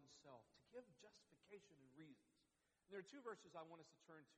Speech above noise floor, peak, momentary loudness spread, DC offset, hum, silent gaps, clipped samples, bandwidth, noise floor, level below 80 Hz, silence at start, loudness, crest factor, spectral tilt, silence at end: 27 dB; -42 dBFS; 10 LU; under 0.1%; none; none; under 0.1%; 9.6 kHz; -86 dBFS; under -90 dBFS; 0 s; -62 LUFS; 20 dB; -4.5 dB/octave; 0 s